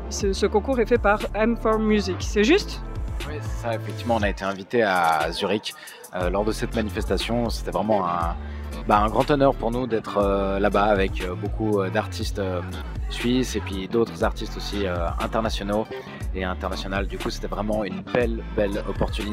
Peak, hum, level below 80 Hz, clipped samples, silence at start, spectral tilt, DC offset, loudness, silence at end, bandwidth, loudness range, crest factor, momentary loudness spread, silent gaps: -4 dBFS; none; -32 dBFS; under 0.1%; 0 s; -5.5 dB/octave; under 0.1%; -24 LUFS; 0 s; 16 kHz; 5 LU; 20 dB; 11 LU; none